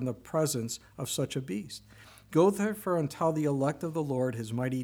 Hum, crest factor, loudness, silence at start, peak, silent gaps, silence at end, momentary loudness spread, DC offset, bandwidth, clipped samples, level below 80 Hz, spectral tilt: none; 18 dB; -31 LUFS; 0 s; -14 dBFS; none; 0 s; 12 LU; under 0.1%; over 20 kHz; under 0.1%; -64 dBFS; -5.5 dB/octave